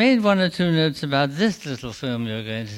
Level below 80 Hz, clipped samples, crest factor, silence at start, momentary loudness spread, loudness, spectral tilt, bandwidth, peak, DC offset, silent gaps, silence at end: -56 dBFS; under 0.1%; 16 dB; 0 s; 11 LU; -22 LUFS; -6 dB/octave; 15.5 kHz; -6 dBFS; under 0.1%; none; 0 s